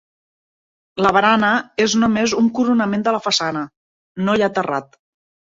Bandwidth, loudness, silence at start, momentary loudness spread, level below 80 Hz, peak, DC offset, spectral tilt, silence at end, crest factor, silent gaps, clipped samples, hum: 7.8 kHz; -17 LUFS; 0.95 s; 12 LU; -56 dBFS; -2 dBFS; under 0.1%; -4 dB/octave; 0.65 s; 18 dB; 3.77-4.15 s; under 0.1%; none